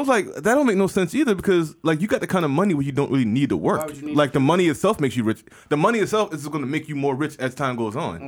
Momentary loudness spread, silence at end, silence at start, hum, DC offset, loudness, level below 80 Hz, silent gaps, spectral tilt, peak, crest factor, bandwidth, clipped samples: 7 LU; 0 s; 0 s; none; under 0.1%; -21 LUFS; -54 dBFS; none; -6 dB/octave; -6 dBFS; 16 dB; 19.5 kHz; under 0.1%